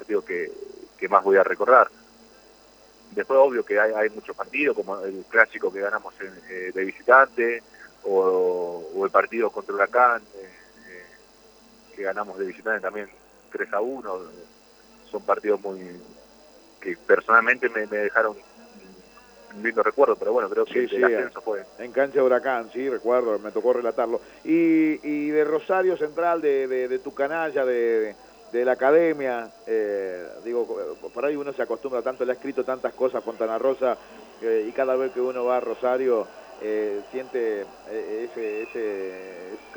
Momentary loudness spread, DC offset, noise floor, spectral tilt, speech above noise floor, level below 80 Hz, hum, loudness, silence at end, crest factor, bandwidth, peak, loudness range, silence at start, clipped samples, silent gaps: 15 LU; under 0.1%; -53 dBFS; -6 dB/octave; 29 dB; -68 dBFS; none; -24 LUFS; 0 s; 24 dB; over 20 kHz; -2 dBFS; 8 LU; 0 s; under 0.1%; none